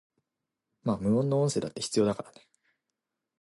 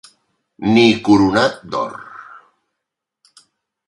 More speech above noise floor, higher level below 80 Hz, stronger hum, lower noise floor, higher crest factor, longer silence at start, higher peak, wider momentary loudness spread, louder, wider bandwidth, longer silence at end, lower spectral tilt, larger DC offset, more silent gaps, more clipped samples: second, 59 dB vs 66 dB; second, -62 dBFS vs -50 dBFS; neither; first, -87 dBFS vs -81 dBFS; about the same, 18 dB vs 18 dB; first, 0.85 s vs 0.6 s; second, -12 dBFS vs 0 dBFS; second, 11 LU vs 22 LU; second, -29 LUFS vs -15 LUFS; about the same, 11.5 kHz vs 11.5 kHz; second, 1.1 s vs 1.65 s; about the same, -6 dB/octave vs -5.5 dB/octave; neither; neither; neither